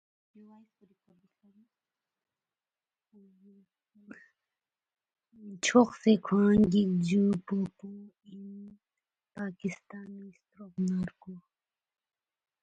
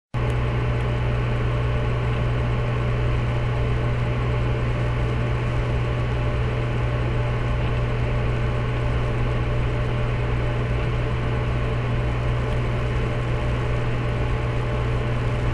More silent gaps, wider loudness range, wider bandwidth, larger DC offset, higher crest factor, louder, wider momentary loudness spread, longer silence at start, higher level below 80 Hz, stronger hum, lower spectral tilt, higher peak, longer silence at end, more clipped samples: neither; first, 13 LU vs 1 LU; first, 9 kHz vs 8 kHz; neither; first, 22 dB vs 12 dB; second, -28 LUFS vs -24 LUFS; first, 25 LU vs 1 LU; first, 4.1 s vs 0.15 s; second, -64 dBFS vs -28 dBFS; neither; second, -6 dB/octave vs -7.5 dB/octave; about the same, -10 dBFS vs -10 dBFS; first, 1.25 s vs 0 s; neither